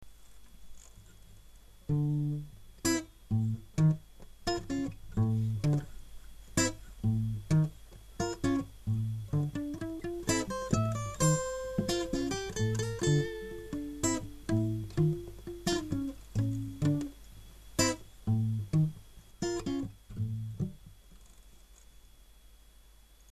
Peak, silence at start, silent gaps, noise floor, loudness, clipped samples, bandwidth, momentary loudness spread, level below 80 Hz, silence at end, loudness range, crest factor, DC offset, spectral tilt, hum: -12 dBFS; 0 s; none; -58 dBFS; -33 LUFS; under 0.1%; 14 kHz; 10 LU; -50 dBFS; 1.75 s; 4 LU; 22 dB; under 0.1%; -5.5 dB/octave; none